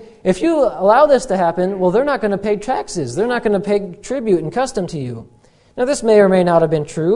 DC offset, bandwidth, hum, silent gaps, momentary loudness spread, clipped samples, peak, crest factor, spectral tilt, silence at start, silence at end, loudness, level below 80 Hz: under 0.1%; 11 kHz; none; none; 11 LU; under 0.1%; 0 dBFS; 16 dB; -6 dB/octave; 0 s; 0 s; -16 LUFS; -46 dBFS